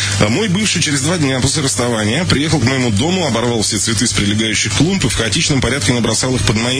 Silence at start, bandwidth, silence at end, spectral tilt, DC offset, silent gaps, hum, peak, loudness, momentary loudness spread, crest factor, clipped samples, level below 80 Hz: 0 s; 11 kHz; 0 s; -3.5 dB/octave; under 0.1%; none; none; 0 dBFS; -14 LUFS; 2 LU; 14 dB; under 0.1%; -34 dBFS